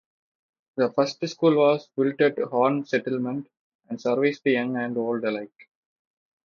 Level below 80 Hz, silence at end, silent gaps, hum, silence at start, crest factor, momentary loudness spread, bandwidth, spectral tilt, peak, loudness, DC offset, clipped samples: -74 dBFS; 1 s; 3.59-3.79 s; none; 0.75 s; 18 dB; 11 LU; 7.2 kHz; -6.5 dB/octave; -6 dBFS; -24 LUFS; under 0.1%; under 0.1%